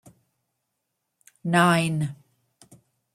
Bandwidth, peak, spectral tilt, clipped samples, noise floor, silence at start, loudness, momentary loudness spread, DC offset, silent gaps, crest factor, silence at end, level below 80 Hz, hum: 13.5 kHz; -4 dBFS; -5.5 dB/octave; under 0.1%; -80 dBFS; 1.45 s; -23 LUFS; 14 LU; under 0.1%; none; 22 dB; 1 s; -66 dBFS; none